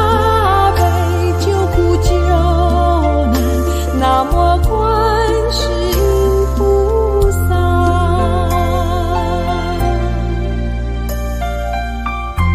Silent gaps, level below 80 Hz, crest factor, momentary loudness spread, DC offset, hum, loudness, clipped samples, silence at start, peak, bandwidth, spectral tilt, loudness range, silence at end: none; -18 dBFS; 12 dB; 8 LU; under 0.1%; none; -15 LUFS; under 0.1%; 0 s; 0 dBFS; 15.5 kHz; -6.5 dB/octave; 4 LU; 0 s